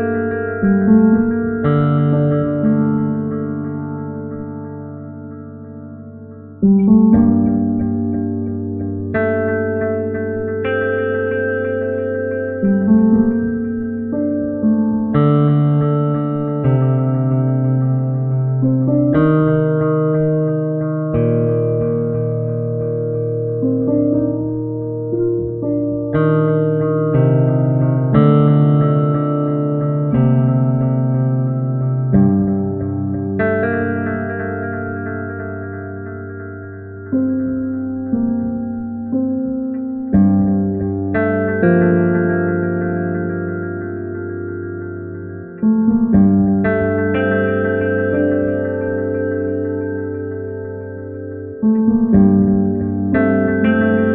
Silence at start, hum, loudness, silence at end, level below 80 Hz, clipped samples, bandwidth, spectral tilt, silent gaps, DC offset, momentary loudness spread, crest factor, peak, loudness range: 0 s; none; -17 LUFS; 0 s; -44 dBFS; under 0.1%; 3.9 kHz; -9.5 dB/octave; none; under 0.1%; 13 LU; 16 dB; 0 dBFS; 7 LU